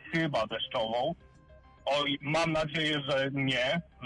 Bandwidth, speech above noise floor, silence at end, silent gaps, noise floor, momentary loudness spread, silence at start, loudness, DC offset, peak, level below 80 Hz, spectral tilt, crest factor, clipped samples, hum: 11.5 kHz; 26 dB; 0 s; none; -56 dBFS; 4 LU; 0 s; -30 LUFS; under 0.1%; -18 dBFS; -58 dBFS; -5 dB/octave; 14 dB; under 0.1%; none